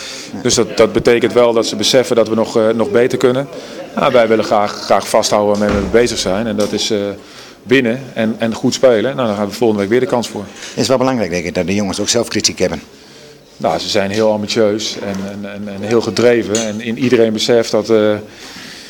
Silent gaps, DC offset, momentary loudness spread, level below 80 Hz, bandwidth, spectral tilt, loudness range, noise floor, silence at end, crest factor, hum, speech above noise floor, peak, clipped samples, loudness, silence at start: none; under 0.1%; 12 LU; -42 dBFS; 18.5 kHz; -4 dB/octave; 4 LU; -39 dBFS; 0 s; 14 dB; none; 25 dB; 0 dBFS; under 0.1%; -14 LUFS; 0 s